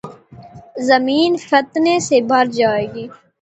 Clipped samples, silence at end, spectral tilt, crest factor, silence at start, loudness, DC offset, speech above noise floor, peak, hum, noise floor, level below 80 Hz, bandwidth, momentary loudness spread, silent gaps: under 0.1%; 0.3 s; -4 dB/octave; 16 dB; 0.05 s; -16 LUFS; under 0.1%; 24 dB; 0 dBFS; none; -39 dBFS; -58 dBFS; 8.2 kHz; 18 LU; none